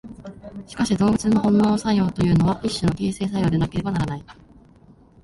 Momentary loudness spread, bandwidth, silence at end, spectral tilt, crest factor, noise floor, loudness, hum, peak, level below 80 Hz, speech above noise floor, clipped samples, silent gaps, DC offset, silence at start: 18 LU; 11.5 kHz; 0.9 s; -6.5 dB/octave; 14 dB; -51 dBFS; -21 LUFS; none; -8 dBFS; -42 dBFS; 30 dB; under 0.1%; none; under 0.1%; 0.05 s